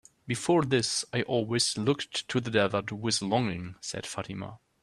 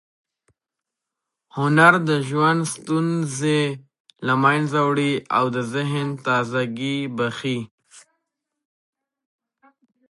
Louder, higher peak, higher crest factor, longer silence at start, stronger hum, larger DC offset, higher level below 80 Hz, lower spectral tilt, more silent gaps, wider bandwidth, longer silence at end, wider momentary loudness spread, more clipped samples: second, -29 LUFS vs -21 LUFS; second, -10 dBFS vs -2 dBFS; about the same, 18 dB vs 22 dB; second, 0.25 s vs 1.55 s; neither; neither; about the same, -64 dBFS vs -68 dBFS; second, -4 dB/octave vs -5.5 dB/octave; second, none vs 4.00-4.05 s, 7.71-7.78 s; first, 13 kHz vs 11.5 kHz; second, 0.25 s vs 2.1 s; about the same, 11 LU vs 12 LU; neither